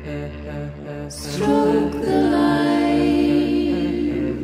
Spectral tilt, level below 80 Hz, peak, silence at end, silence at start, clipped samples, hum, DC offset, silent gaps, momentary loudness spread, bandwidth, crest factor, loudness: -6.5 dB/octave; -38 dBFS; -6 dBFS; 0 s; 0 s; under 0.1%; none; under 0.1%; none; 14 LU; 14.5 kHz; 12 dB; -19 LUFS